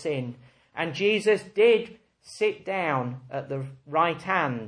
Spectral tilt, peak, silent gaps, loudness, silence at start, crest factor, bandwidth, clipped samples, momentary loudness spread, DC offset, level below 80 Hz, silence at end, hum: -5.5 dB/octave; -8 dBFS; none; -26 LUFS; 0 s; 18 dB; 10.5 kHz; under 0.1%; 15 LU; under 0.1%; -70 dBFS; 0 s; none